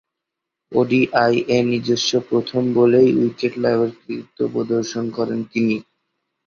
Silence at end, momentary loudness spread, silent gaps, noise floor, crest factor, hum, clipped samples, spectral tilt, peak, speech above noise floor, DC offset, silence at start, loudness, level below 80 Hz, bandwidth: 0.65 s; 9 LU; none; -82 dBFS; 18 dB; none; under 0.1%; -5.5 dB/octave; -2 dBFS; 64 dB; under 0.1%; 0.7 s; -19 LUFS; -60 dBFS; 7.2 kHz